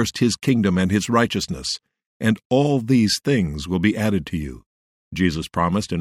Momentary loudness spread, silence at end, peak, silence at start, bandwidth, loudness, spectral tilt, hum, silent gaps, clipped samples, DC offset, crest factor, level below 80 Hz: 9 LU; 0 s; -4 dBFS; 0 s; 15.5 kHz; -21 LUFS; -5.5 dB/octave; none; 2.06-2.20 s, 2.45-2.50 s, 4.66-5.11 s; under 0.1%; under 0.1%; 18 dB; -44 dBFS